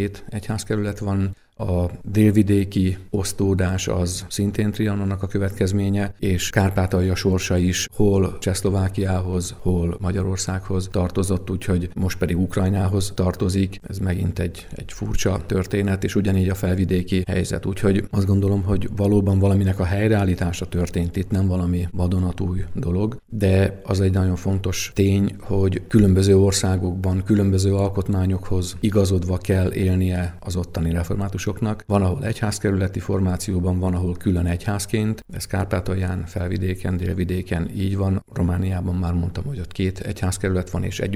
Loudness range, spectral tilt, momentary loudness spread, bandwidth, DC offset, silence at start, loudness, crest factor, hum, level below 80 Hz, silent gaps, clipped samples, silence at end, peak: 5 LU; -6.5 dB/octave; 7 LU; 14 kHz; under 0.1%; 0 s; -22 LUFS; 20 dB; none; -38 dBFS; none; under 0.1%; 0 s; -2 dBFS